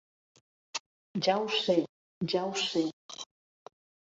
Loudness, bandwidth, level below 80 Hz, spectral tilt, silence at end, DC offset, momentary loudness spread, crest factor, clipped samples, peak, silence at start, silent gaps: -31 LUFS; 8 kHz; -78 dBFS; -4 dB/octave; 0.95 s; under 0.1%; 16 LU; 20 dB; under 0.1%; -14 dBFS; 0.75 s; 0.80-1.14 s, 1.89-2.21 s, 2.93-3.09 s